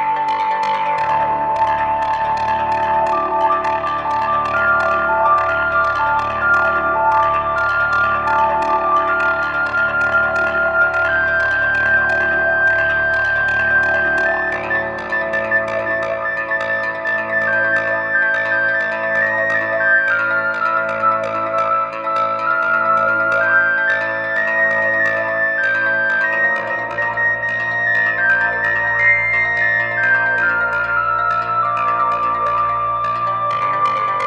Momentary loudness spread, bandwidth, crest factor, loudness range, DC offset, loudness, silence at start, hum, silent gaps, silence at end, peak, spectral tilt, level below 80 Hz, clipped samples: 5 LU; 9.6 kHz; 14 dB; 3 LU; under 0.1%; -16 LUFS; 0 s; none; none; 0 s; -4 dBFS; -5 dB/octave; -46 dBFS; under 0.1%